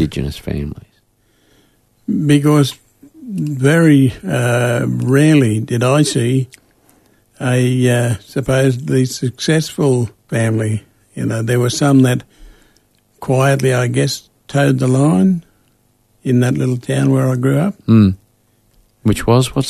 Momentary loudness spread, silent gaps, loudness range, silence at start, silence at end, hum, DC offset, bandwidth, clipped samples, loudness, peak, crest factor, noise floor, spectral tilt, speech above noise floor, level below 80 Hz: 12 LU; none; 3 LU; 0 s; 0 s; none; under 0.1%; 13.5 kHz; under 0.1%; -15 LUFS; 0 dBFS; 16 dB; -57 dBFS; -6.5 dB/octave; 44 dB; -42 dBFS